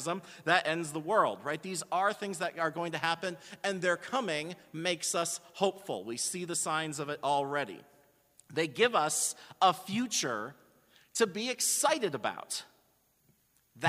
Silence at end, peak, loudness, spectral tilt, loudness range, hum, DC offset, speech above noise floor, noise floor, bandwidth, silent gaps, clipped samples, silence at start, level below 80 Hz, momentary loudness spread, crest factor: 0 s; -10 dBFS; -32 LUFS; -2.5 dB/octave; 3 LU; none; under 0.1%; 38 dB; -70 dBFS; 15.5 kHz; none; under 0.1%; 0 s; -80 dBFS; 10 LU; 24 dB